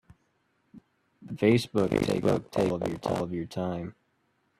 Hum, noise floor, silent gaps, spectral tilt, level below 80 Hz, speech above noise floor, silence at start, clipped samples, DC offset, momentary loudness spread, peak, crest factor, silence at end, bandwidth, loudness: none; -72 dBFS; none; -6.5 dB/octave; -56 dBFS; 45 dB; 0.75 s; under 0.1%; under 0.1%; 10 LU; -10 dBFS; 20 dB; 0.7 s; 14 kHz; -28 LUFS